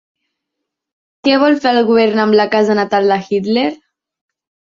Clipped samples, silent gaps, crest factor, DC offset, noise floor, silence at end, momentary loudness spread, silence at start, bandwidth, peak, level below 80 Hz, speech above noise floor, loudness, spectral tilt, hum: under 0.1%; none; 14 dB; under 0.1%; -78 dBFS; 1 s; 5 LU; 1.25 s; 7.4 kHz; -2 dBFS; -60 dBFS; 65 dB; -13 LUFS; -6 dB/octave; none